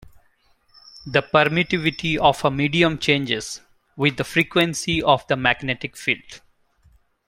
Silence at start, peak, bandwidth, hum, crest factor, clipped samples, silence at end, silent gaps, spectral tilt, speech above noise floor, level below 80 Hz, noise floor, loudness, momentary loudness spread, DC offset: 0.95 s; 0 dBFS; 16.5 kHz; none; 22 dB; under 0.1%; 0.9 s; none; -4.5 dB/octave; 40 dB; -50 dBFS; -61 dBFS; -20 LUFS; 8 LU; under 0.1%